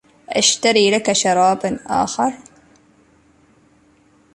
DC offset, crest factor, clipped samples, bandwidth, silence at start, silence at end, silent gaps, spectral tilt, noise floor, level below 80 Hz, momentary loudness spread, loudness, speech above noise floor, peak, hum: under 0.1%; 18 dB; under 0.1%; 11.5 kHz; 0.3 s; 2 s; none; -2.5 dB/octave; -54 dBFS; -56 dBFS; 9 LU; -16 LUFS; 38 dB; -2 dBFS; none